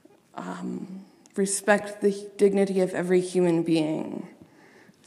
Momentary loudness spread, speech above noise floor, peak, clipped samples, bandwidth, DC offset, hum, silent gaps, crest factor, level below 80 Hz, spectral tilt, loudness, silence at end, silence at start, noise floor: 17 LU; 30 dB; -6 dBFS; under 0.1%; 14 kHz; under 0.1%; none; none; 20 dB; -78 dBFS; -5.5 dB/octave; -25 LUFS; 0.75 s; 0.35 s; -54 dBFS